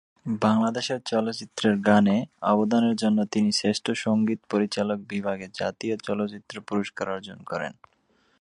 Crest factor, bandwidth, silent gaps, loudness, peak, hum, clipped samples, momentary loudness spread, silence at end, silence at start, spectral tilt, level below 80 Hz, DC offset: 20 dB; 11 kHz; none; -25 LUFS; -6 dBFS; none; under 0.1%; 11 LU; 0.7 s; 0.25 s; -5.5 dB/octave; -64 dBFS; under 0.1%